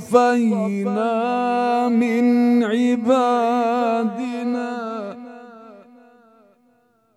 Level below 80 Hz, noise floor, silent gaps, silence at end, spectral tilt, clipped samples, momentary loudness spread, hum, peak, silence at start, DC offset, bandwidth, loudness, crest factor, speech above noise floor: -76 dBFS; -61 dBFS; none; 1.35 s; -6.5 dB/octave; under 0.1%; 12 LU; none; -2 dBFS; 0 s; under 0.1%; 11.5 kHz; -19 LUFS; 18 dB; 43 dB